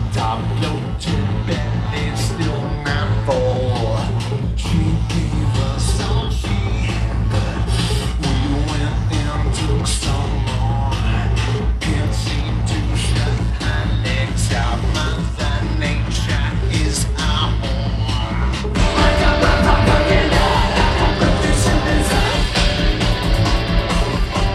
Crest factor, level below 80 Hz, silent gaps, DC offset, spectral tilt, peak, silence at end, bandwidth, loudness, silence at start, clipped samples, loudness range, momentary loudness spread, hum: 16 dB; -22 dBFS; none; under 0.1%; -5 dB/octave; 0 dBFS; 0 s; 13 kHz; -18 LUFS; 0 s; under 0.1%; 4 LU; 6 LU; none